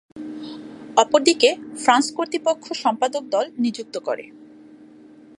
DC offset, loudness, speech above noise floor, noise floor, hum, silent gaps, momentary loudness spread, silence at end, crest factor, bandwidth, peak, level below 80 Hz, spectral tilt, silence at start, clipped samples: under 0.1%; -21 LUFS; 26 dB; -46 dBFS; none; none; 17 LU; 1.15 s; 22 dB; 11.5 kHz; 0 dBFS; -72 dBFS; -2 dB/octave; 0.15 s; under 0.1%